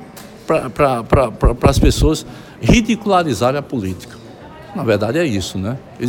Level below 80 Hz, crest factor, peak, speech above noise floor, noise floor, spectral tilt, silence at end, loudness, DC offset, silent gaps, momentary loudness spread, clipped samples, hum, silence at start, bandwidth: -24 dBFS; 16 dB; 0 dBFS; 20 dB; -36 dBFS; -6 dB/octave; 0 s; -16 LUFS; under 0.1%; none; 20 LU; under 0.1%; none; 0 s; 17 kHz